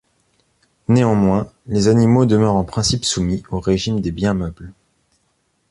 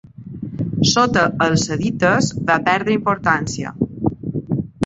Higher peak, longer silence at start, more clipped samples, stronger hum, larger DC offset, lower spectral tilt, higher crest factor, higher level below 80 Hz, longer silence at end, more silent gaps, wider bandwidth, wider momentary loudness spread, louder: about the same, -2 dBFS vs -2 dBFS; first, 0.9 s vs 0.2 s; neither; neither; neither; first, -6 dB/octave vs -4.5 dB/octave; about the same, 16 dB vs 18 dB; first, -38 dBFS vs -46 dBFS; first, 1 s vs 0 s; neither; first, 11.5 kHz vs 8.2 kHz; about the same, 9 LU vs 11 LU; about the same, -17 LUFS vs -18 LUFS